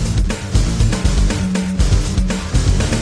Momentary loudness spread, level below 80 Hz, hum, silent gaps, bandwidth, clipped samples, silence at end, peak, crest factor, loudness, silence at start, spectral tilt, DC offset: 3 LU; -18 dBFS; none; none; 11 kHz; under 0.1%; 0 s; -4 dBFS; 12 dB; -18 LUFS; 0 s; -5.5 dB/octave; under 0.1%